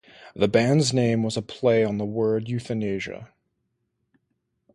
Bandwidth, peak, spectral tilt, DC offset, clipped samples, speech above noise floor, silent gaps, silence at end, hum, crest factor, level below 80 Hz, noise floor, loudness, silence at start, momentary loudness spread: 11.5 kHz; -6 dBFS; -6 dB/octave; under 0.1%; under 0.1%; 53 dB; none; 1.5 s; none; 20 dB; -58 dBFS; -76 dBFS; -23 LUFS; 0.2 s; 11 LU